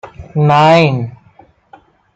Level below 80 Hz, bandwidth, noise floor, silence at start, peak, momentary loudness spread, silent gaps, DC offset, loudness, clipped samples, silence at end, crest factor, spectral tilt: -48 dBFS; 8 kHz; -46 dBFS; 0.05 s; 0 dBFS; 15 LU; none; under 0.1%; -11 LUFS; under 0.1%; 1.05 s; 14 dB; -7 dB/octave